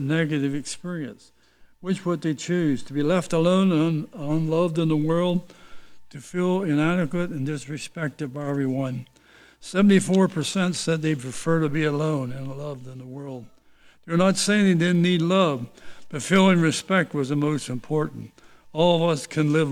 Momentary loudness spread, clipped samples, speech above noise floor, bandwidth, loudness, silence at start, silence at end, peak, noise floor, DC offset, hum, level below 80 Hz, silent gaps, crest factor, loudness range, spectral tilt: 15 LU; under 0.1%; 31 dB; 13.5 kHz; -23 LUFS; 0 s; 0 s; -6 dBFS; -53 dBFS; under 0.1%; none; -56 dBFS; none; 18 dB; 5 LU; -6 dB/octave